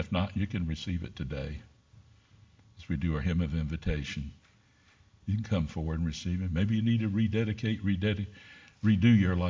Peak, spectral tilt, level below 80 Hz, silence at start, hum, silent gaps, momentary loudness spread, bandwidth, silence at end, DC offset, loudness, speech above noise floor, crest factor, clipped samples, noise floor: -12 dBFS; -7.5 dB/octave; -42 dBFS; 0 s; none; none; 12 LU; 7.6 kHz; 0 s; under 0.1%; -31 LUFS; 34 dB; 18 dB; under 0.1%; -63 dBFS